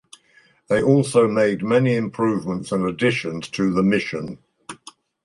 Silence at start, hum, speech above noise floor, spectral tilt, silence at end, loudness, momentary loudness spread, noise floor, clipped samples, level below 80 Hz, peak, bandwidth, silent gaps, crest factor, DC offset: 0.7 s; none; 37 dB; -6.5 dB/octave; 0.5 s; -20 LUFS; 20 LU; -57 dBFS; under 0.1%; -54 dBFS; -4 dBFS; 11.5 kHz; none; 18 dB; under 0.1%